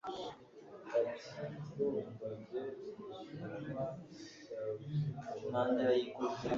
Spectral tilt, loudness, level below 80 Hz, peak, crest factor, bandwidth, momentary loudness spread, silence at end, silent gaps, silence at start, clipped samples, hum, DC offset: -6 dB/octave; -40 LUFS; -72 dBFS; -20 dBFS; 18 dB; 7.6 kHz; 15 LU; 0 s; none; 0.05 s; under 0.1%; none; under 0.1%